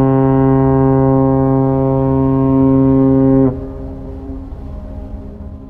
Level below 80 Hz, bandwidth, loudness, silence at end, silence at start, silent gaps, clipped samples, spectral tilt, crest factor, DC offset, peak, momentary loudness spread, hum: -30 dBFS; 3 kHz; -12 LUFS; 0 s; 0 s; none; under 0.1%; -13 dB/octave; 12 dB; under 0.1%; -2 dBFS; 18 LU; none